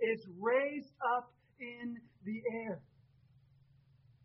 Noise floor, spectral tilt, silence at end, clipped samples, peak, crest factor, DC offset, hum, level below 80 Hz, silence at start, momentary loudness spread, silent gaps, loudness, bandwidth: -67 dBFS; -4 dB/octave; 1.45 s; under 0.1%; -22 dBFS; 18 dB; under 0.1%; none; -80 dBFS; 0 s; 15 LU; none; -38 LUFS; 5.6 kHz